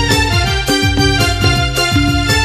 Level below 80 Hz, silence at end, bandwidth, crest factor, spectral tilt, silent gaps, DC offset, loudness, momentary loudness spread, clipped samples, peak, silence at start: -22 dBFS; 0 s; 15.5 kHz; 12 dB; -4 dB/octave; none; under 0.1%; -12 LUFS; 1 LU; under 0.1%; 0 dBFS; 0 s